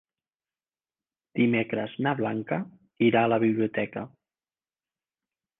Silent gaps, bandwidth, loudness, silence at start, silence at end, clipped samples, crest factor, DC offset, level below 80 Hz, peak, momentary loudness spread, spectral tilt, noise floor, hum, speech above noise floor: none; 3.9 kHz; -26 LUFS; 1.35 s; 1.5 s; under 0.1%; 18 dB; under 0.1%; -70 dBFS; -10 dBFS; 14 LU; -10 dB/octave; under -90 dBFS; none; over 64 dB